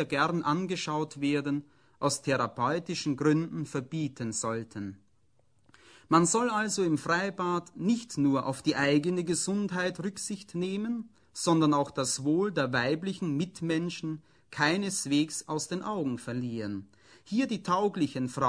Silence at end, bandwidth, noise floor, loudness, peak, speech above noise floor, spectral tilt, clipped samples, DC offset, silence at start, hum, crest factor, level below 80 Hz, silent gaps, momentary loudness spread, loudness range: 0 s; 10.5 kHz; -71 dBFS; -30 LUFS; -8 dBFS; 41 dB; -4.5 dB/octave; under 0.1%; under 0.1%; 0 s; none; 22 dB; -68 dBFS; none; 9 LU; 3 LU